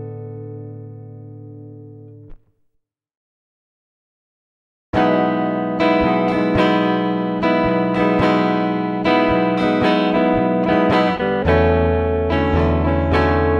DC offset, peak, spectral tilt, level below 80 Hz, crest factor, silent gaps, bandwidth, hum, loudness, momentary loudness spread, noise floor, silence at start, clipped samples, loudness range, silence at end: under 0.1%; -2 dBFS; -8 dB/octave; -34 dBFS; 16 dB; 3.17-4.93 s; 7.4 kHz; none; -17 LUFS; 18 LU; -69 dBFS; 0 s; under 0.1%; 8 LU; 0 s